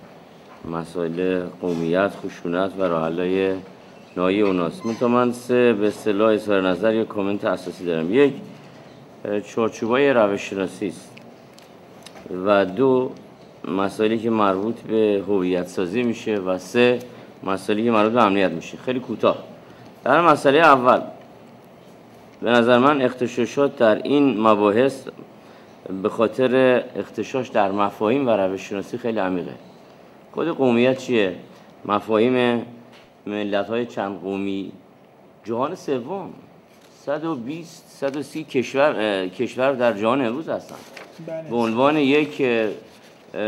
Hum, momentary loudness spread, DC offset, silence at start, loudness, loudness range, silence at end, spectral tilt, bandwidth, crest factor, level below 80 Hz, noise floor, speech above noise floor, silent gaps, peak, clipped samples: none; 16 LU; under 0.1%; 0 s; -21 LUFS; 6 LU; 0 s; -6 dB/octave; 14 kHz; 20 dB; -66 dBFS; -50 dBFS; 29 dB; none; 0 dBFS; under 0.1%